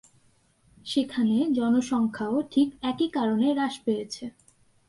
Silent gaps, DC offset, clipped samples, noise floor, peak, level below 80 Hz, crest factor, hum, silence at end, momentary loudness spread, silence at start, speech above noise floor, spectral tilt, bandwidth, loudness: none; under 0.1%; under 0.1%; -63 dBFS; -12 dBFS; -66 dBFS; 14 dB; none; 0.6 s; 9 LU; 0.85 s; 38 dB; -5.5 dB/octave; 11.5 kHz; -26 LUFS